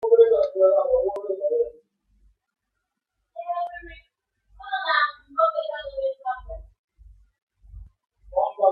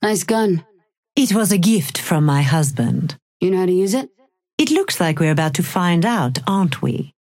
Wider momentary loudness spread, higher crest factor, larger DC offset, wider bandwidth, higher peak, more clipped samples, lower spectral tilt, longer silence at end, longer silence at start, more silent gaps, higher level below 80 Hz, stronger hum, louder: first, 22 LU vs 8 LU; first, 20 dB vs 14 dB; neither; second, 5 kHz vs 17 kHz; about the same, -4 dBFS vs -4 dBFS; neither; about the same, -6 dB/octave vs -5.5 dB/octave; second, 0 s vs 0.25 s; about the same, 0 s vs 0 s; second, 6.79-6.88 s, 7.42-7.47 s vs 0.98-1.03 s, 3.22-3.40 s, 4.53-4.58 s; first, -52 dBFS vs -60 dBFS; neither; second, -23 LUFS vs -18 LUFS